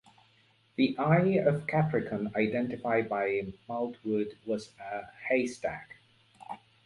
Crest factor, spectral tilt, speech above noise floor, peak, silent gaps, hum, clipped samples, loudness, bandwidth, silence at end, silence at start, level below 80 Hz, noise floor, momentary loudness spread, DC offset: 20 dB; -7.5 dB/octave; 36 dB; -12 dBFS; none; none; under 0.1%; -30 LUFS; 11 kHz; 0.3 s; 0.8 s; -66 dBFS; -66 dBFS; 14 LU; under 0.1%